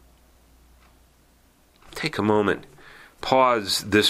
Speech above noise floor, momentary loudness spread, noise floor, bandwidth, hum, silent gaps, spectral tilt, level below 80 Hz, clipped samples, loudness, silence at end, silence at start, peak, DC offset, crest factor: 37 dB; 13 LU; -58 dBFS; 16 kHz; none; none; -4 dB/octave; -54 dBFS; under 0.1%; -22 LUFS; 0 s; 1.9 s; -4 dBFS; under 0.1%; 20 dB